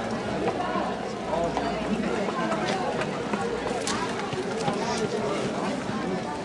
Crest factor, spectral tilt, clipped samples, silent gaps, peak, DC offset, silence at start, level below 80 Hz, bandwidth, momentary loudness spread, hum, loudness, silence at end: 18 dB; -5 dB/octave; under 0.1%; none; -10 dBFS; under 0.1%; 0 s; -52 dBFS; 11.5 kHz; 3 LU; none; -28 LUFS; 0 s